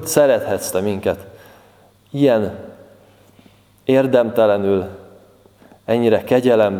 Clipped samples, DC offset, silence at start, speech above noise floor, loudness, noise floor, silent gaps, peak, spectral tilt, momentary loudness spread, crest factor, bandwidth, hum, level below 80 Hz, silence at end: under 0.1%; under 0.1%; 0 s; 35 dB; -17 LUFS; -51 dBFS; none; 0 dBFS; -5.5 dB/octave; 14 LU; 18 dB; 18.5 kHz; none; -58 dBFS; 0 s